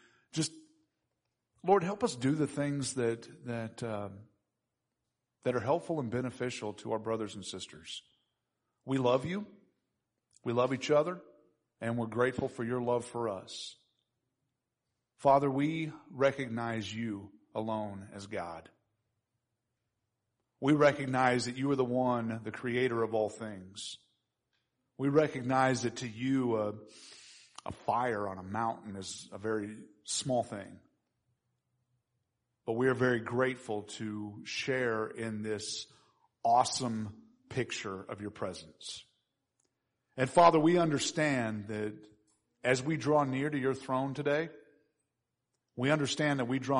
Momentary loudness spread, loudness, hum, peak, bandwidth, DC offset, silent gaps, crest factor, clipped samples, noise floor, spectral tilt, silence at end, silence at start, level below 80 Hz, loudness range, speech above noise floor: 15 LU; -33 LUFS; none; -10 dBFS; 10.5 kHz; under 0.1%; none; 24 dB; under 0.1%; -86 dBFS; -5 dB/octave; 0 s; 0.35 s; -70 dBFS; 7 LU; 54 dB